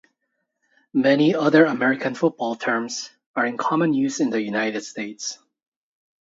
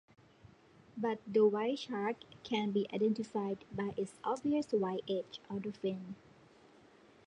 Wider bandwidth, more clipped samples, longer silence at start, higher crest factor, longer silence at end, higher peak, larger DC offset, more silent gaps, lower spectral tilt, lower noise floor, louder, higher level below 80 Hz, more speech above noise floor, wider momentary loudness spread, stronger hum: second, 7.8 kHz vs 10 kHz; neither; about the same, 0.95 s vs 0.95 s; about the same, 20 dB vs 18 dB; second, 0.95 s vs 1.1 s; first, -2 dBFS vs -18 dBFS; neither; first, 3.26-3.34 s vs none; second, -5 dB/octave vs -6.5 dB/octave; first, -76 dBFS vs -62 dBFS; first, -22 LUFS vs -36 LUFS; about the same, -74 dBFS vs -74 dBFS; first, 55 dB vs 27 dB; about the same, 14 LU vs 12 LU; neither